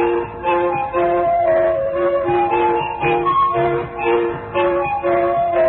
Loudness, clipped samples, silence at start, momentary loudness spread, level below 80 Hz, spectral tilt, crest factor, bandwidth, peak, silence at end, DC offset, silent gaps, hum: -17 LUFS; under 0.1%; 0 s; 4 LU; -44 dBFS; -11.5 dB/octave; 10 dB; 4.2 kHz; -6 dBFS; 0 s; under 0.1%; none; none